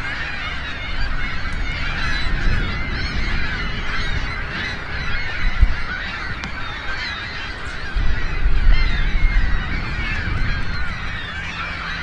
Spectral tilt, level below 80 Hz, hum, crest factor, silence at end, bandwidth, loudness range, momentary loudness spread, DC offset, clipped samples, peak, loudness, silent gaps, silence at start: -5 dB/octave; -22 dBFS; none; 18 dB; 0 s; 7.8 kHz; 2 LU; 5 LU; under 0.1%; under 0.1%; -2 dBFS; -24 LUFS; none; 0 s